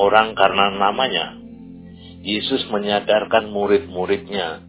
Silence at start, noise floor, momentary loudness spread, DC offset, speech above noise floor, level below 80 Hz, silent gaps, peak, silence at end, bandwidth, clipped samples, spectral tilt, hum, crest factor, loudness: 0 s; -39 dBFS; 22 LU; under 0.1%; 20 dB; -50 dBFS; none; 0 dBFS; 0 s; 4 kHz; under 0.1%; -8.5 dB/octave; none; 20 dB; -19 LUFS